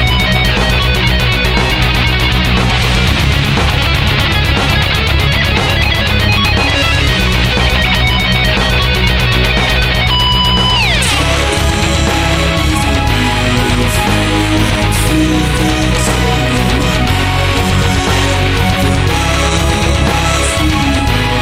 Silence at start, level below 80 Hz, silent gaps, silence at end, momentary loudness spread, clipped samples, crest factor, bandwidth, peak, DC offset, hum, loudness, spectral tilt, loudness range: 0 s; -18 dBFS; none; 0 s; 2 LU; under 0.1%; 10 dB; 16.5 kHz; 0 dBFS; 0.6%; none; -11 LUFS; -4.5 dB/octave; 2 LU